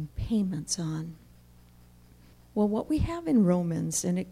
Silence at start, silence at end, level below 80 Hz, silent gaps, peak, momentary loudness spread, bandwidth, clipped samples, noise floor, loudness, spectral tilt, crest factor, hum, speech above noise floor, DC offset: 0 s; 0 s; -46 dBFS; none; -14 dBFS; 11 LU; 16 kHz; under 0.1%; -55 dBFS; -28 LUFS; -6 dB/octave; 14 dB; 60 Hz at -55 dBFS; 28 dB; under 0.1%